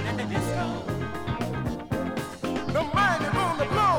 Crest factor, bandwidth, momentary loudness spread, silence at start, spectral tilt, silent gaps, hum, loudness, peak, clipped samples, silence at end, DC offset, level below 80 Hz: 14 dB; over 20 kHz; 8 LU; 0 s; -5.5 dB/octave; none; none; -27 LUFS; -12 dBFS; under 0.1%; 0 s; under 0.1%; -44 dBFS